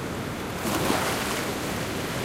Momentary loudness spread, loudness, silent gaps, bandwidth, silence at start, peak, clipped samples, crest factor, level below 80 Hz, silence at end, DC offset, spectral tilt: 7 LU; -27 LUFS; none; 16 kHz; 0 s; -10 dBFS; under 0.1%; 18 dB; -46 dBFS; 0 s; under 0.1%; -4 dB/octave